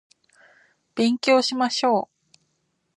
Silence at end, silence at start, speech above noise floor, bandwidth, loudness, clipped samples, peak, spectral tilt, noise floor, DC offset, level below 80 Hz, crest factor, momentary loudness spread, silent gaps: 0.9 s; 0.95 s; 52 dB; 11 kHz; -21 LUFS; under 0.1%; -6 dBFS; -3.5 dB/octave; -72 dBFS; under 0.1%; -78 dBFS; 18 dB; 13 LU; none